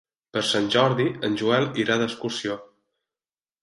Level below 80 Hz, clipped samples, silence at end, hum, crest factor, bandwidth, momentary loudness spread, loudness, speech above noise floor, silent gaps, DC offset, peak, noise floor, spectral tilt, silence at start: -64 dBFS; under 0.1%; 1 s; none; 18 dB; 11.5 kHz; 10 LU; -23 LUFS; over 67 dB; none; under 0.1%; -6 dBFS; under -90 dBFS; -4.5 dB/octave; 0.35 s